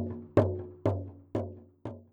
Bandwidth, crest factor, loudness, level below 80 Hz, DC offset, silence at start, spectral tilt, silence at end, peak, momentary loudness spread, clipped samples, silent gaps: 7.4 kHz; 24 dB; -32 LUFS; -62 dBFS; under 0.1%; 0 s; -10 dB/octave; 0.1 s; -10 dBFS; 17 LU; under 0.1%; none